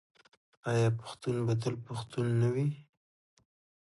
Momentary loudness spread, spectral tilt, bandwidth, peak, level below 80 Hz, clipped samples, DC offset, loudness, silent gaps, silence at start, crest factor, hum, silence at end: 10 LU; -7 dB/octave; 11.5 kHz; -18 dBFS; -66 dBFS; under 0.1%; under 0.1%; -33 LUFS; none; 0.65 s; 16 dB; none; 1.1 s